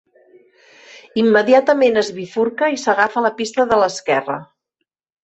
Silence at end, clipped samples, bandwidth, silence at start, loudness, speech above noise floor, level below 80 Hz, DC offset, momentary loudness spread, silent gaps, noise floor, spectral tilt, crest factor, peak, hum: 0.8 s; under 0.1%; 8.2 kHz; 1.15 s; -16 LUFS; 60 dB; -60 dBFS; under 0.1%; 9 LU; none; -76 dBFS; -4 dB/octave; 16 dB; 0 dBFS; none